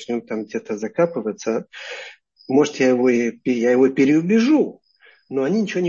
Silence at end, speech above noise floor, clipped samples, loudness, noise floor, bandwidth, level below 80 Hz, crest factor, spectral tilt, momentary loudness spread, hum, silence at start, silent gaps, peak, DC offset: 0 s; 34 dB; under 0.1%; -19 LUFS; -53 dBFS; 7.4 kHz; -68 dBFS; 16 dB; -6 dB/octave; 12 LU; none; 0 s; none; -4 dBFS; under 0.1%